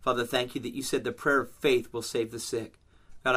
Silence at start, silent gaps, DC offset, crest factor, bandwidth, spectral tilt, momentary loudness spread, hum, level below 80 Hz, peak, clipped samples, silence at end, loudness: 0 s; none; under 0.1%; 20 dB; 16 kHz; -3.5 dB/octave; 8 LU; none; -58 dBFS; -10 dBFS; under 0.1%; 0 s; -30 LUFS